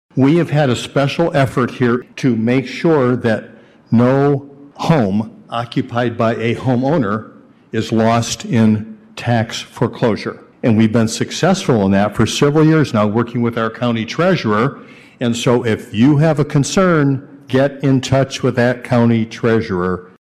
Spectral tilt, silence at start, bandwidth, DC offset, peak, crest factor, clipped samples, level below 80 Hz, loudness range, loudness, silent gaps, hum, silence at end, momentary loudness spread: -6.5 dB/octave; 0.15 s; 13.5 kHz; under 0.1%; -2 dBFS; 12 dB; under 0.1%; -48 dBFS; 3 LU; -16 LUFS; none; none; 0.3 s; 8 LU